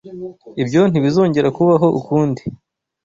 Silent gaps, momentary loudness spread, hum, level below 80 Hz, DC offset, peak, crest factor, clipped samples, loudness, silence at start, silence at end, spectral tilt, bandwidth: none; 17 LU; none; -52 dBFS; under 0.1%; -2 dBFS; 14 dB; under 0.1%; -15 LUFS; 0.05 s; 0.5 s; -8 dB/octave; 7.6 kHz